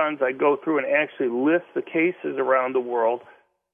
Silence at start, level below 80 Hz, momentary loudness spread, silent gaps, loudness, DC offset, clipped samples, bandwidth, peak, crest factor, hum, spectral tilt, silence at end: 0 s; -78 dBFS; 4 LU; none; -23 LUFS; under 0.1%; under 0.1%; 3.6 kHz; -6 dBFS; 16 dB; none; -8.5 dB/octave; 0.5 s